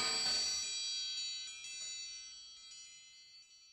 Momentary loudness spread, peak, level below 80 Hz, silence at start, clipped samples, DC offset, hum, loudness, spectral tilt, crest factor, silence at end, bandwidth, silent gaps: 23 LU; -26 dBFS; -76 dBFS; 0 s; under 0.1%; under 0.1%; none; -37 LUFS; 2 dB/octave; 16 dB; 0 s; 13.5 kHz; none